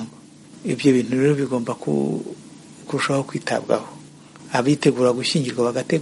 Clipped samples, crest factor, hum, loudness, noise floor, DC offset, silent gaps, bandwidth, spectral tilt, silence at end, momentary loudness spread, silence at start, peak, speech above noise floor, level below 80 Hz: under 0.1%; 20 dB; none; -21 LUFS; -44 dBFS; under 0.1%; none; 11.5 kHz; -5.5 dB/octave; 0 s; 14 LU; 0 s; -2 dBFS; 24 dB; -64 dBFS